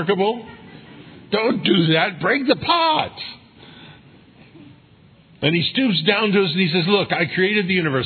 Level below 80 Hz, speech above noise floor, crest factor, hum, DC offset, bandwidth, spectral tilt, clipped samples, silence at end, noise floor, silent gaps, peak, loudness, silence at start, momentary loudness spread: -62 dBFS; 32 dB; 20 dB; none; under 0.1%; 4.6 kHz; -8.5 dB/octave; under 0.1%; 0 s; -50 dBFS; none; -2 dBFS; -18 LUFS; 0 s; 7 LU